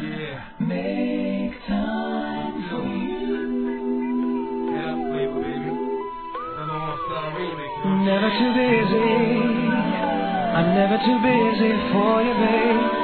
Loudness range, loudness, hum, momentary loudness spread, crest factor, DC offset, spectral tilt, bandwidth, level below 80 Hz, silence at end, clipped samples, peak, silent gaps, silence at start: 7 LU; -22 LUFS; none; 10 LU; 16 dB; 0.3%; -10 dB/octave; 4.5 kHz; -48 dBFS; 0 s; under 0.1%; -6 dBFS; none; 0 s